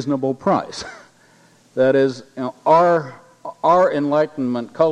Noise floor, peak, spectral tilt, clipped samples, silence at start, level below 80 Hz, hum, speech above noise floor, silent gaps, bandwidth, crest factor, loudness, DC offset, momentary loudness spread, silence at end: -53 dBFS; -2 dBFS; -6.5 dB/octave; under 0.1%; 0 s; -64 dBFS; none; 35 dB; none; 10 kHz; 16 dB; -18 LUFS; under 0.1%; 17 LU; 0 s